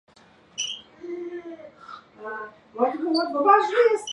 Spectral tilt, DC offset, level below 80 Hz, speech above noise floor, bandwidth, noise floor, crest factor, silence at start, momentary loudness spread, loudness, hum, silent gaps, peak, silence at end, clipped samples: -2 dB/octave; under 0.1%; -74 dBFS; 32 dB; 11 kHz; -54 dBFS; 20 dB; 0.55 s; 24 LU; -23 LUFS; none; none; -4 dBFS; 0 s; under 0.1%